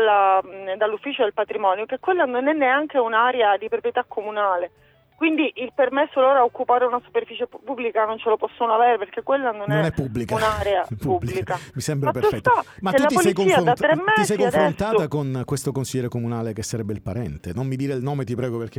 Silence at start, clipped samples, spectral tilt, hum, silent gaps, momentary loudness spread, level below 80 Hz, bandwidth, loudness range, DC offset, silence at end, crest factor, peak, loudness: 0 s; under 0.1%; -5.5 dB/octave; none; none; 10 LU; -50 dBFS; 17.5 kHz; 4 LU; under 0.1%; 0.1 s; 16 dB; -6 dBFS; -22 LUFS